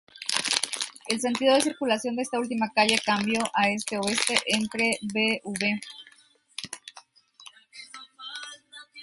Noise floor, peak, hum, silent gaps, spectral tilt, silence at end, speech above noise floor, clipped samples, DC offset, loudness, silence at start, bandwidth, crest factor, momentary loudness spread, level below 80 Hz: -59 dBFS; -2 dBFS; none; none; -2.5 dB/octave; 0 s; 34 dB; under 0.1%; under 0.1%; -25 LUFS; 0.15 s; 12 kHz; 26 dB; 21 LU; -70 dBFS